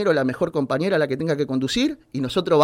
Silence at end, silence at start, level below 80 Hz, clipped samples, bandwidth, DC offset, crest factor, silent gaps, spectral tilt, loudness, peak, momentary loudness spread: 0 s; 0 s; -52 dBFS; under 0.1%; 16 kHz; under 0.1%; 16 dB; none; -5.5 dB/octave; -22 LUFS; -6 dBFS; 4 LU